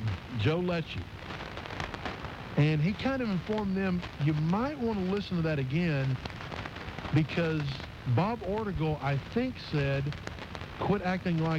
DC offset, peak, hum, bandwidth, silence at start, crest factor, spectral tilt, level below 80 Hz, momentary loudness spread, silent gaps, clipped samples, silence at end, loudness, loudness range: under 0.1%; -14 dBFS; none; 8.4 kHz; 0 s; 18 dB; -7.5 dB/octave; -48 dBFS; 11 LU; none; under 0.1%; 0 s; -32 LUFS; 2 LU